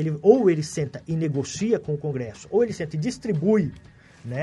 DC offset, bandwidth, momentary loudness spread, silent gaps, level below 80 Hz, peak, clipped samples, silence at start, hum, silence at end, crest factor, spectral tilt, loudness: under 0.1%; 11.5 kHz; 12 LU; none; -56 dBFS; -2 dBFS; under 0.1%; 0 s; none; 0 s; 20 dB; -7 dB/octave; -24 LUFS